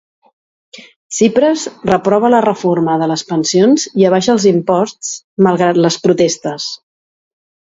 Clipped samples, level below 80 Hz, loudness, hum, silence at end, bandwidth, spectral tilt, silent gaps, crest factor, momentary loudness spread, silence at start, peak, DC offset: under 0.1%; -54 dBFS; -13 LUFS; none; 1 s; 8 kHz; -5 dB/octave; 0.96-1.10 s, 5.24-5.37 s; 14 dB; 10 LU; 0.75 s; 0 dBFS; under 0.1%